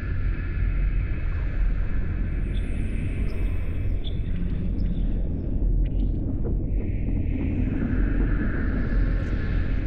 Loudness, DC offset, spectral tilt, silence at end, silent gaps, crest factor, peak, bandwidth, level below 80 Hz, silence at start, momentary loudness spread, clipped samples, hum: -28 LUFS; under 0.1%; -9.5 dB/octave; 0 s; none; 10 dB; -12 dBFS; 4.1 kHz; -26 dBFS; 0 s; 3 LU; under 0.1%; none